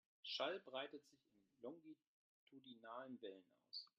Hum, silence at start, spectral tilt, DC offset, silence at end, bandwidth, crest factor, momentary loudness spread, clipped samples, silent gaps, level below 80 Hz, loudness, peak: none; 0.25 s; -0.5 dB/octave; under 0.1%; 0.1 s; 7.2 kHz; 24 dB; 20 LU; under 0.1%; 2.07-2.47 s; under -90 dBFS; -52 LUFS; -30 dBFS